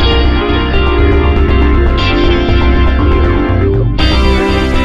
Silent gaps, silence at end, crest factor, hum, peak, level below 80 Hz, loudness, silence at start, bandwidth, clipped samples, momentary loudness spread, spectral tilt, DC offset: none; 0 s; 8 dB; none; 0 dBFS; -12 dBFS; -11 LUFS; 0 s; 7.4 kHz; under 0.1%; 2 LU; -7.5 dB/octave; 1%